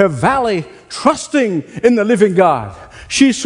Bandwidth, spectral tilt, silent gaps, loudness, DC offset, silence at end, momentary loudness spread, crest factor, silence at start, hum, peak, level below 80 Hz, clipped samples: 11 kHz; -5 dB/octave; none; -14 LUFS; under 0.1%; 0 s; 9 LU; 14 dB; 0 s; none; 0 dBFS; -46 dBFS; under 0.1%